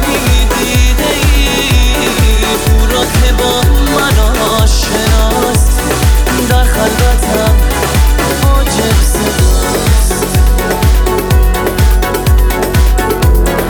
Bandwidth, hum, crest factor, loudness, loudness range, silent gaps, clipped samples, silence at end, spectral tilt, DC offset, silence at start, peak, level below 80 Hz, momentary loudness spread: over 20 kHz; none; 8 dB; -10 LUFS; 1 LU; none; under 0.1%; 0 s; -4.5 dB/octave; under 0.1%; 0 s; 0 dBFS; -10 dBFS; 1 LU